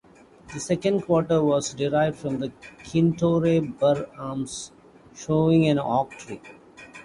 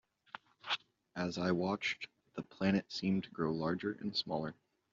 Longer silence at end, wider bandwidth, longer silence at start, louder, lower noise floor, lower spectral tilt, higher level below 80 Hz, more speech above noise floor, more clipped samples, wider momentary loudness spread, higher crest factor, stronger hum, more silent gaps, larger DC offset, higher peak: second, 0 s vs 0.4 s; first, 11.5 kHz vs 7.4 kHz; second, 0.45 s vs 0.65 s; first, -24 LUFS vs -37 LUFS; second, -49 dBFS vs -55 dBFS; first, -6.5 dB/octave vs -4 dB/octave; first, -54 dBFS vs -72 dBFS; first, 26 dB vs 19 dB; neither; first, 19 LU vs 15 LU; about the same, 16 dB vs 18 dB; neither; neither; neither; first, -8 dBFS vs -20 dBFS